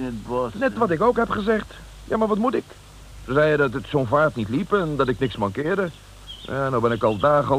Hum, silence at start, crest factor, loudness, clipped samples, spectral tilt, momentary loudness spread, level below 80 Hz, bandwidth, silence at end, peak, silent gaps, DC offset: none; 0 s; 16 dB; -22 LUFS; under 0.1%; -7 dB/octave; 10 LU; -44 dBFS; 15 kHz; 0 s; -6 dBFS; none; under 0.1%